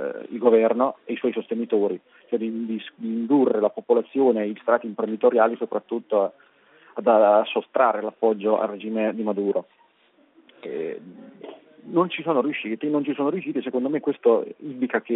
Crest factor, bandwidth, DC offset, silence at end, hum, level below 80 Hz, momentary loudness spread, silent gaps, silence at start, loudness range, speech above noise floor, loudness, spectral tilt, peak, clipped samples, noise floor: 18 dB; 4 kHz; under 0.1%; 0 s; none; -76 dBFS; 12 LU; none; 0 s; 6 LU; 38 dB; -23 LUFS; -4.5 dB/octave; -4 dBFS; under 0.1%; -60 dBFS